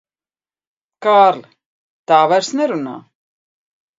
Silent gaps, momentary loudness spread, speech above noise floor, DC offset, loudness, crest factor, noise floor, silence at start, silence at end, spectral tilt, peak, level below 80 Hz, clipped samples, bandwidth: 1.66-2.04 s; 18 LU; over 76 dB; under 0.1%; -14 LUFS; 18 dB; under -90 dBFS; 1 s; 1 s; -4 dB/octave; 0 dBFS; -74 dBFS; under 0.1%; 7.8 kHz